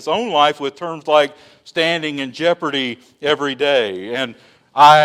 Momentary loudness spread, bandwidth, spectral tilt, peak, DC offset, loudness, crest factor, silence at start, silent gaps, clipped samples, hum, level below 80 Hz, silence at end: 10 LU; 15.5 kHz; -4 dB/octave; 0 dBFS; under 0.1%; -18 LUFS; 16 dB; 0 s; none; 0.2%; none; -66 dBFS; 0 s